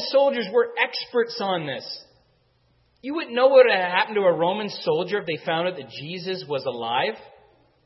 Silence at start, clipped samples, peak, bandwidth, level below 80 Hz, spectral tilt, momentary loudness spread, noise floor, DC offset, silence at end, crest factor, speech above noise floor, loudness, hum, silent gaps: 0 s; under 0.1%; -4 dBFS; 6 kHz; -74 dBFS; -6 dB/octave; 15 LU; -64 dBFS; under 0.1%; 0.6 s; 20 dB; 41 dB; -23 LUFS; none; none